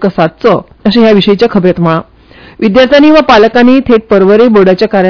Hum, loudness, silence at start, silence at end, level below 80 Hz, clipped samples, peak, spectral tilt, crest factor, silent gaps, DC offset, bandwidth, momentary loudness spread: none; -6 LUFS; 0 s; 0 s; -36 dBFS; 10%; 0 dBFS; -7.5 dB/octave; 6 dB; none; under 0.1%; 5.4 kHz; 7 LU